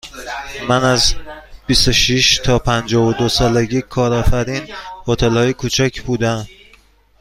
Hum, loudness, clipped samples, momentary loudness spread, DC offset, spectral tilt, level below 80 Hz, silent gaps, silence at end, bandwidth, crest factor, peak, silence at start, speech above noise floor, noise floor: none; -15 LUFS; under 0.1%; 15 LU; under 0.1%; -4 dB/octave; -28 dBFS; none; 0.7 s; 16 kHz; 16 dB; 0 dBFS; 0.05 s; 35 dB; -50 dBFS